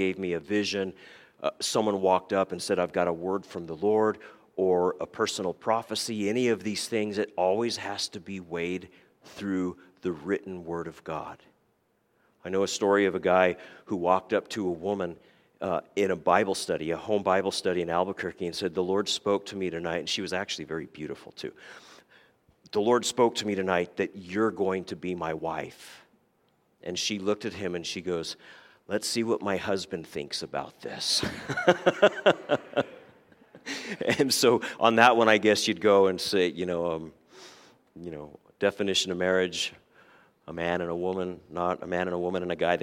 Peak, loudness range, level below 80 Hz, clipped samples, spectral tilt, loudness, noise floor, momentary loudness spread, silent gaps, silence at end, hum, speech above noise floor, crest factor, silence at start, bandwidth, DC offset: -2 dBFS; 9 LU; -66 dBFS; under 0.1%; -4 dB/octave; -28 LUFS; -71 dBFS; 14 LU; none; 0 s; none; 43 dB; 26 dB; 0 s; 16.5 kHz; under 0.1%